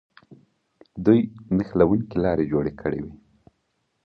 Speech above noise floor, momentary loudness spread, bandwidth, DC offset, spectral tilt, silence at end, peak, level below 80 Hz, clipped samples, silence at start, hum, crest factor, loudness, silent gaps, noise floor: 51 dB; 12 LU; 5.8 kHz; under 0.1%; -10.5 dB/octave; 0.9 s; -4 dBFS; -48 dBFS; under 0.1%; 0.3 s; none; 20 dB; -23 LUFS; none; -73 dBFS